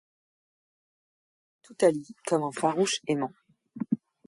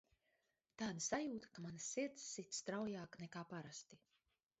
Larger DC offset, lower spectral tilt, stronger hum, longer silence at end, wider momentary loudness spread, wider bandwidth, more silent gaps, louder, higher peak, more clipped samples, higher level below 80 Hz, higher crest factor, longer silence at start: neither; about the same, -4.5 dB/octave vs -4.5 dB/octave; neither; second, 0.3 s vs 0.65 s; about the same, 10 LU vs 11 LU; first, 11.5 kHz vs 8 kHz; neither; first, -28 LUFS vs -47 LUFS; first, -10 dBFS vs -28 dBFS; neither; first, -76 dBFS vs -82 dBFS; about the same, 22 dB vs 22 dB; first, 1.7 s vs 0.8 s